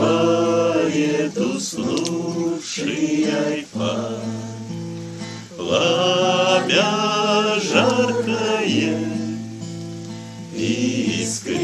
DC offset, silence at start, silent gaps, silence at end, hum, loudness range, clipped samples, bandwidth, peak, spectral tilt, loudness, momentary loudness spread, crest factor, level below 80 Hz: under 0.1%; 0 s; none; 0 s; none; 6 LU; under 0.1%; 13 kHz; -2 dBFS; -4 dB/octave; -20 LUFS; 14 LU; 20 dB; -62 dBFS